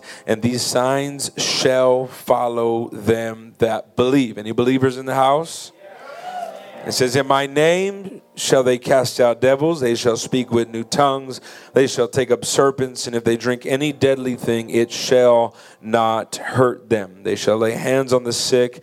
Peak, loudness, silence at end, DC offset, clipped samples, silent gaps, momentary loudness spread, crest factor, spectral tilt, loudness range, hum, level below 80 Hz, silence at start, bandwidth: 0 dBFS; -18 LUFS; 0 s; under 0.1%; under 0.1%; none; 9 LU; 18 dB; -4.5 dB/octave; 2 LU; none; -62 dBFS; 0.05 s; 16 kHz